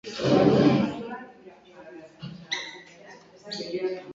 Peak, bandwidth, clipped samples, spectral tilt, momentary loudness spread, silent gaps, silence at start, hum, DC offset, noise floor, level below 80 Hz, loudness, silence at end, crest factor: -6 dBFS; 7.8 kHz; under 0.1%; -6.5 dB/octave; 26 LU; none; 0.05 s; none; under 0.1%; -50 dBFS; -58 dBFS; -24 LUFS; 0 s; 20 dB